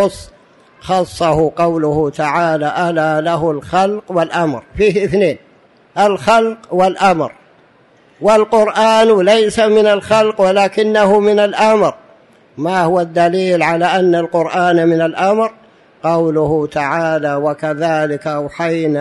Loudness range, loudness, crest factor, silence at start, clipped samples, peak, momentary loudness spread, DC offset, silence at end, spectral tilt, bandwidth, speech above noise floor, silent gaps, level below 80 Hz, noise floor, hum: 5 LU; -14 LUFS; 12 dB; 0 s; under 0.1%; -2 dBFS; 7 LU; under 0.1%; 0 s; -5.5 dB/octave; 11.5 kHz; 36 dB; none; -46 dBFS; -49 dBFS; none